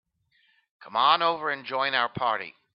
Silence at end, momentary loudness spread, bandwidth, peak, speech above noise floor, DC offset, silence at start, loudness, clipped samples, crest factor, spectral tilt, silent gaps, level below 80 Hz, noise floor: 0.25 s; 9 LU; 5.6 kHz; -6 dBFS; 42 dB; under 0.1%; 0.8 s; -25 LUFS; under 0.1%; 22 dB; -7 dB/octave; none; -74 dBFS; -68 dBFS